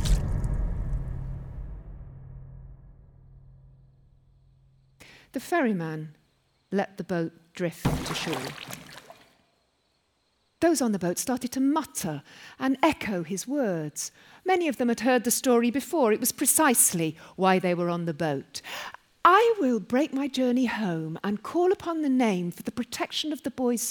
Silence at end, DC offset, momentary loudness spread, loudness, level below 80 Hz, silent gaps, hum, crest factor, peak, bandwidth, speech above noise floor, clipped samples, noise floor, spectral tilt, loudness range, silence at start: 0 s; under 0.1%; 17 LU; -26 LUFS; -40 dBFS; none; none; 22 dB; -6 dBFS; over 20 kHz; 45 dB; under 0.1%; -71 dBFS; -4 dB/octave; 11 LU; 0 s